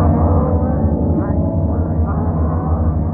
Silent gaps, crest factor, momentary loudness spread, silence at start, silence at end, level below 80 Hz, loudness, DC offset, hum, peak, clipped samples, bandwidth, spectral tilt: none; 12 dB; 3 LU; 0 s; 0 s; -22 dBFS; -17 LUFS; under 0.1%; none; -2 dBFS; under 0.1%; 2.2 kHz; -14.5 dB/octave